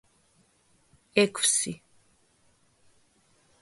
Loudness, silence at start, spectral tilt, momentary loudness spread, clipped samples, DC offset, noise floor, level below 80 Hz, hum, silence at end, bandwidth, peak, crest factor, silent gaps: -25 LUFS; 1.15 s; -2 dB/octave; 13 LU; under 0.1%; under 0.1%; -66 dBFS; -72 dBFS; none; 1.85 s; 12 kHz; -6 dBFS; 26 dB; none